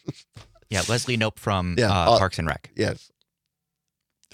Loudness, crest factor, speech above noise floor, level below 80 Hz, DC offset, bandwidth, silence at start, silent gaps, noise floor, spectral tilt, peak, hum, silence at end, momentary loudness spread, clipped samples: -23 LUFS; 24 dB; 60 dB; -48 dBFS; under 0.1%; 16 kHz; 0.05 s; none; -83 dBFS; -4.5 dB/octave; -2 dBFS; none; 1.35 s; 10 LU; under 0.1%